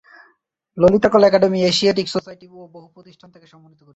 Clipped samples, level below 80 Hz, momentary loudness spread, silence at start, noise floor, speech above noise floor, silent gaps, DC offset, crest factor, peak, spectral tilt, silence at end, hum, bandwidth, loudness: under 0.1%; -52 dBFS; 12 LU; 0.75 s; -62 dBFS; 44 dB; none; under 0.1%; 18 dB; -2 dBFS; -5.5 dB/octave; 1.15 s; none; 8.2 kHz; -16 LUFS